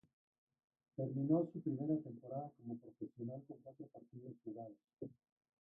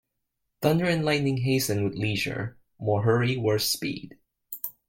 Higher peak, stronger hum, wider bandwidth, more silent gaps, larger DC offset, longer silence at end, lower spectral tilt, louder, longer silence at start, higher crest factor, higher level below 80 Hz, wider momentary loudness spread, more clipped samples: second, -24 dBFS vs -8 dBFS; neither; second, 1.6 kHz vs 17 kHz; neither; neither; first, 0.5 s vs 0.2 s; first, -13.5 dB/octave vs -5 dB/octave; second, -44 LUFS vs -26 LUFS; first, 1 s vs 0.6 s; about the same, 22 dB vs 18 dB; second, -86 dBFS vs -58 dBFS; first, 19 LU vs 12 LU; neither